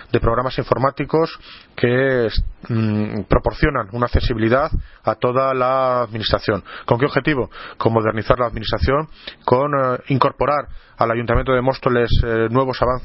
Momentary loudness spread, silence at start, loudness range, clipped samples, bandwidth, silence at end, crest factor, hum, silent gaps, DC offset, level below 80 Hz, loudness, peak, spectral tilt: 6 LU; 0 s; 1 LU; under 0.1%; 5.8 kHz; 0 s; 18 dB; none; none; under 0.1%; -30 dBFS; -19 LUFS; 0 dBFS; -10 dB/octave